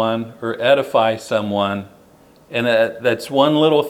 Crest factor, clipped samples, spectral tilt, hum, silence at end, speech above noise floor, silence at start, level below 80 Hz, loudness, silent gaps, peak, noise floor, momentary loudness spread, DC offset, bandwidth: 18 dB; under 0.1%; -5.5 dB/octave; none; 0 s; 31 dB; 0 s; -64 dBFS; -18 LUFS; none; 0 dBFS; -49 dBFS; 9 LU; under 0.1%; 16 kHz